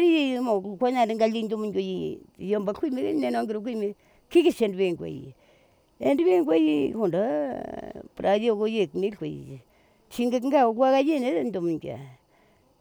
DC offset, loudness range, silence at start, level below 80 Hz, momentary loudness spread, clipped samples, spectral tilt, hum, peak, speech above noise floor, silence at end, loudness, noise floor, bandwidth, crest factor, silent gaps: under 0.1%; 3 LU; 0 s; -64 dBFS; 15 LU; under 0.1%; -6.5 dB/octave; none; -10 dBFS; 37 dB; 0.65 s; -25 LUFS; -61 dBFS; over 20 kHz; 16 dB; none